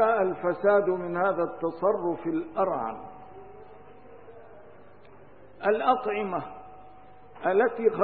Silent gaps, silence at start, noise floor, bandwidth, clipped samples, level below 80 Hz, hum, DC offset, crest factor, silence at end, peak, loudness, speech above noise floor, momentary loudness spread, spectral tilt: none; 0 s; -53 dBFS; 4.6 kHz; under 0.1%; -66 dBFS; none; 0.3%; 20 dB; 0 s; -8 dBFS; -27 LUFS; 27 dB; 23 LU; -10 dB/octave